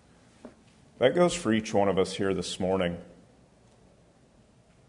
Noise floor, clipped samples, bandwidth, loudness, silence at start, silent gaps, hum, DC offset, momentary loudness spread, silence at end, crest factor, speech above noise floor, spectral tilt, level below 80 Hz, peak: -60 dBFS; under 0.1%; 11 kHz; -27 LUFS; 0.45 s; none; none; under 0.1%; 6 LU; 1.75 s; 20 dB; 34 dB; -5 dB/octave; -62 dBFS; -8 dBFS